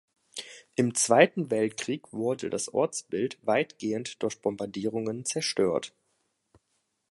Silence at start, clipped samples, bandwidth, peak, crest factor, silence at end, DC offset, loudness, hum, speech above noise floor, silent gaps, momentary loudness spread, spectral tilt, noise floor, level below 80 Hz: 0.35 s; under 0.1%; 11.5 kHz; -4 dBFS; 24 dB; 1.25 s; under 0.1%; -28 LUFS; none; 49 dB; none; 12 LU; -4 dB/octave; -77 dBFS; -70 dBFS